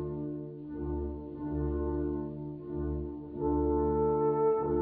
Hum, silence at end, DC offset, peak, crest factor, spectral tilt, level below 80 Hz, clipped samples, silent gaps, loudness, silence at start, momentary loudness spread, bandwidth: none; 0 s; under 0.1%; -18 dBFS; 14 dB; -11.5 dB/octave; -42 dBFS; under 0.1%; none; -33 LUFS; 0 s; 11 LU; 2.8 kHz